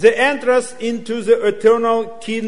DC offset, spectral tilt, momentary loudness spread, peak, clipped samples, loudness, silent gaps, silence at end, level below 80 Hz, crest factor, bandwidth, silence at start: 2%; -4 dB/octave; 10 LU; 0 dBFS; under 0.1%; -17 LUFS; none; 0 s; -58 dBFS; 16 dB; 11 kHz; 0 s